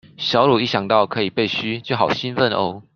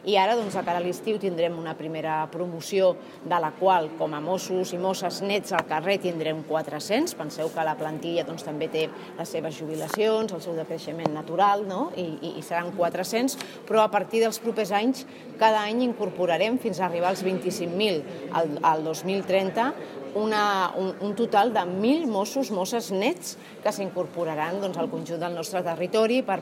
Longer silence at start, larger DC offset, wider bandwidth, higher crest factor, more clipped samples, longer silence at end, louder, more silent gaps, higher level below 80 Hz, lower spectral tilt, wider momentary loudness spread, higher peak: first, 0.2 s vs 0 s; neither; second, 7 kHz vs 16 kHz; about the same, 18 dB vs 22 dB; neither; first, 0.15 s vs 0 s; first, -19 LUFS vs -26 LUFS; neither; first, -58 dBFS vs -78 dBFS; first, -6 dB/octave vs -4.5 dB/octave; second, 6 LU vs 9 LU; about the same, -2 dBFS vs -4 dBFS